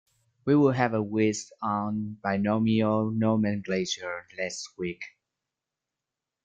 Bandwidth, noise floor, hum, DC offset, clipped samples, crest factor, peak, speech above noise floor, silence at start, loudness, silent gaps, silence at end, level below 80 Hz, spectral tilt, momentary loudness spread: 9 kHz; -88 dBFS; none; under 0.1%; under 0.1%; 20 dB; -8 dBFS; 61 dB; 0.45 s; -27 LUFS; none; 1.35 s; -64 dBFS; -6 dB/octave; 12 LU